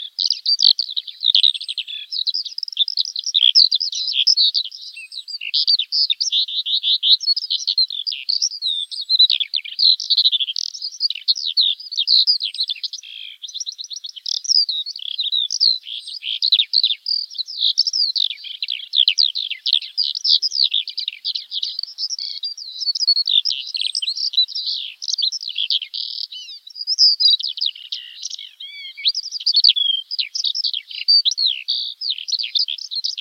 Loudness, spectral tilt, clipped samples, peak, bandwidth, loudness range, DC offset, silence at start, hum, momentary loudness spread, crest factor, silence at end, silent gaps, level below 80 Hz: -17 LUFS; 10.5 dB/octave; under 0.1%; -2 dBFS; 16.5 kHz; 3 LU; under 0.1%; 0 s; none; 14 LU; 18 dB; 0 s; none; under -90 dBFS